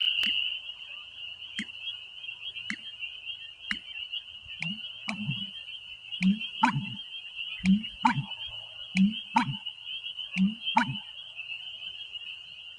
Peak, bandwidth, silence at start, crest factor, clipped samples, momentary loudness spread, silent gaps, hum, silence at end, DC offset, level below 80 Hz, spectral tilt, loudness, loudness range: -8 dBFS; 10 kHz; 0 s; 24 dB; under 0.1%; 13 LU; none; none; 0 s; under 0.1%; -62 dBFS; -4.5 dB/octave; -32 LUFS; 7 LU